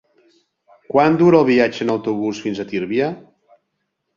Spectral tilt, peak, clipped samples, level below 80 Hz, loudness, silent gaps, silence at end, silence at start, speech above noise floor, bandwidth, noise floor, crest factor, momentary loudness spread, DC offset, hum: -7 dB/octave; -2 dBFS; under 0.1%; -60 dBFS; -17 LUFS; none; 0.95 s; 0.9 s; 57 dB; 7.4 kHz; -74 dBFS; 18 dB; 12 LU; under 0.1%; none